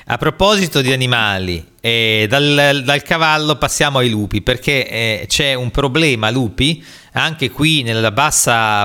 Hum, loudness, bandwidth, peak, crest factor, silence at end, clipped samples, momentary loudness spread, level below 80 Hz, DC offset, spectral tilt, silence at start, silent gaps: none; -14 LUFS; 19 kHz; 0 dBFS; 14 dB; 0 s; under 0.1%; 6 LU; -34 dBFS; under 0.1%; -3.5 dB/octave; 0.1 s; none